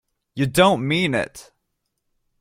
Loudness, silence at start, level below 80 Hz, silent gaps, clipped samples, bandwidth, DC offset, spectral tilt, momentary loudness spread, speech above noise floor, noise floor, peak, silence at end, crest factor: -19 LUFS; 0.35 s; -52 dBFS; none; under 0.1%; 16 kHz; under 0.1%; -5 dB/octave; 14 LU; 56 dB; -75 dBFS; -2 dBFS; 1 s; 22 dB